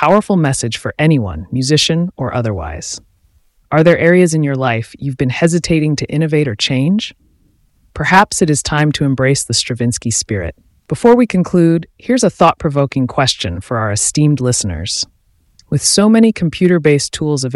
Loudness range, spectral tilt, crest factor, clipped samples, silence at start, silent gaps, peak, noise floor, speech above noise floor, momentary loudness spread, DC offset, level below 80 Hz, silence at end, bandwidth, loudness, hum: 2 LU; -5 dB/octave; 14 dB; under 0.1%; 0 s; none; 0 dBFS; -54 dBFS; 41 dB; 10 LU; under 0.1%; -40 dBFS; 0 s; 12 kHz; -14 LUFS; none